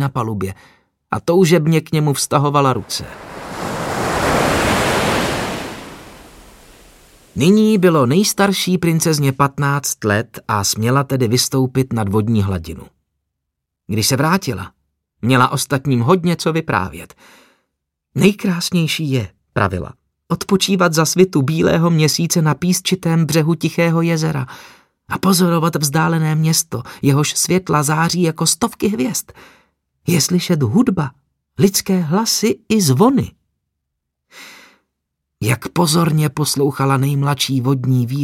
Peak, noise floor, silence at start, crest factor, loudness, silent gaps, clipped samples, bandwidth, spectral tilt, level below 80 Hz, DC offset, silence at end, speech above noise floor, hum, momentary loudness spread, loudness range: 0 dBFS; -78 dBFS; 0 s; 16 dB; -16 LUFS; none; under 0.1%; 16.5 kHz; -5 dB/octave; -44 dBFS; under 0.1%; 0 s; 62 dB; none; 11 LU; 4 LU